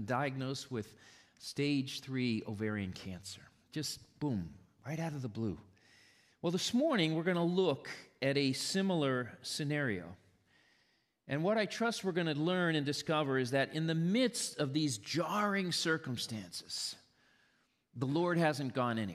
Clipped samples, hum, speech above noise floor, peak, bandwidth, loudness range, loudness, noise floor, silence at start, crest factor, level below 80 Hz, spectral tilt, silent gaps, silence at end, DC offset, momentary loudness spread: under 0.1%; none; 40 dB; -18 dBFS; 15 kHz; 7 LU; -35 LUFS; -75 dBFS; 0 s; 18 dB; -74 dBFS; -5 dB/octave; none; 0 s; under 0.1%; 12 LU